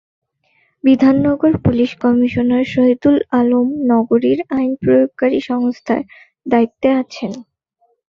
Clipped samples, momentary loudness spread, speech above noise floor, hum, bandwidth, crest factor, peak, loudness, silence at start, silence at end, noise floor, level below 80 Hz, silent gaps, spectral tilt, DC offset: under 0.1%; 8 LU; 48 dB; none; 6.8 kHz; 14 dB; -2 dBFS; -15 LUFS; 0.85 s; 0.7 s; -62 dBFS; -44 dBFS; none; -8 dB/octave; under 0.1%